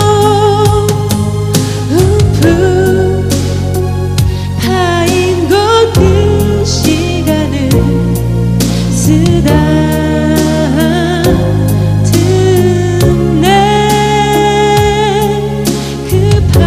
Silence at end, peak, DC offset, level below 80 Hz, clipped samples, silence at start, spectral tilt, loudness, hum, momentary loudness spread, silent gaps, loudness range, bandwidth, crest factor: 0 s; 0 dBFS; under 0.1%; -22 dBFS; 0.3%; 0 s; -6 dB/octave; -10 LUFS; none; 5 LU; none; 2 LU; 16 kHz; 8 dB